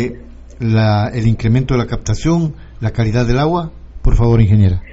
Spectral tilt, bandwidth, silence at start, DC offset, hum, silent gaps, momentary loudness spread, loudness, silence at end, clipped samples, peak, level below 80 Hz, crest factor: -7.5 dB/octave; 7.8 kHz; 0 s; under 0.1%; none; none; 11 LU; -15 LUFS; 0 s; under 0.1%; -2 dBFS; -22 dBFS; 12 dB